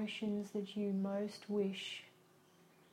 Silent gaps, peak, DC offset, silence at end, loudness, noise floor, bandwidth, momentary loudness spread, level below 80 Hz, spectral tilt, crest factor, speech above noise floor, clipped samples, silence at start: none; -26 dBFS; under 0.1%; 0.85 s; -41 LUFS; -67 dBFS; 13.5 kHz; 8 LU; -84 dBFS; -6 dB/octave; 16 dB; 27 dB; under 0.1%; 0 s